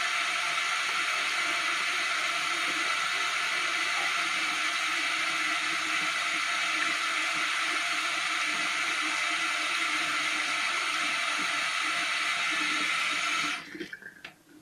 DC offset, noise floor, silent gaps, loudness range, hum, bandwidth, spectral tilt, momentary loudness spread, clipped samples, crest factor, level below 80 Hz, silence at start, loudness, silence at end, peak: under 0.1%; -50 dBFS; none; 0 LU; none; 15.5 kHz; 0.5 dB/octave; 1 LU; under 0.1%; 14 dB; -78 dBFS; 0 s; -27 LUFS; 0.05 s; -16 dBFS